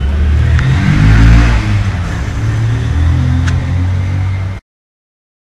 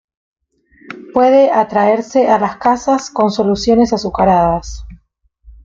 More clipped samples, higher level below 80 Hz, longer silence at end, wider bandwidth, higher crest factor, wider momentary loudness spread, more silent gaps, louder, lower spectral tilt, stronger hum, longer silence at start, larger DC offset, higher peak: first, 0.5% vs under 0.1%; first, -14 dBFS vs -38 dBFS; first, 1 s vs 0.15 s; first, 9.6 kHz vs 7.8 kHz; about the same, 10 dB vs 14 dB; about the same, 9 LU vs 11 LU; neither; about the same, -12 LUFS vs -13 LUFS; first, -7 dB/octave vs -5.5 dB/octave; neither; second, 0 s vs 0.9 s; neither; about the same, 0 dBFS vs 0 dBFS